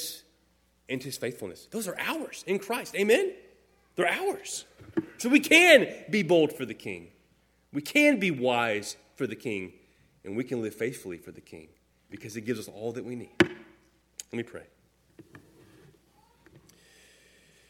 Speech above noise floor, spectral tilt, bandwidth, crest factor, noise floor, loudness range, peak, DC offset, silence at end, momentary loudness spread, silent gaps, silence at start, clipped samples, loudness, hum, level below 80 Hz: 40 dB; -3.5 dB/octave; 18 kHz; 24 dB; -67 dBFS; 14 LU; -4 dBFS; under 0.1%; 2.3 s; 20 LU; none; 0 s; under 0.1%; -27 LUFS; none; -70 dBFS